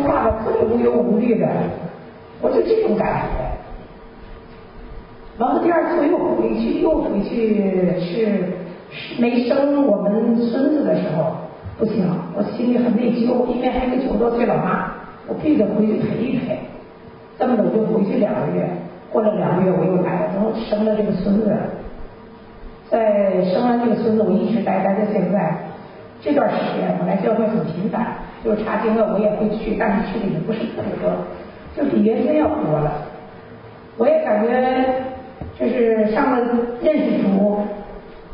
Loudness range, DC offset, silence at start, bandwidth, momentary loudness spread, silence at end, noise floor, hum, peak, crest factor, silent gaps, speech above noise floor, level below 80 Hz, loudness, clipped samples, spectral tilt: 3 LU; under 0.1%; 0 s; 5.4 kHz; 15 LU; 0 s; -40 dBFS; none; -4 dBFS; 16 dB; none; 22 dB; -42 dBFS; -19 LUFS; under 0.1%; -12.5 dB/octave